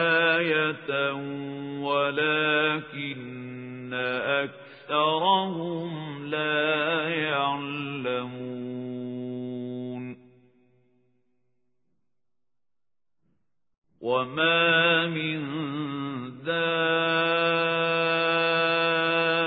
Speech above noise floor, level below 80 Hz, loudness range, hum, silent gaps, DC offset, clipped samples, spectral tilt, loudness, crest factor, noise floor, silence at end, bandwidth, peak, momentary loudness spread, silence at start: over 64 dB; -78 dBFS; 13 LU; none; 13.78-13.82 s; under 0.1%; under 0.1%; -9 dB/octave; -25 LUFS; 18 dB; under -90 dBFS; 0 s; 4.9 kHz; -10 dBFS; 13 LU; 0 s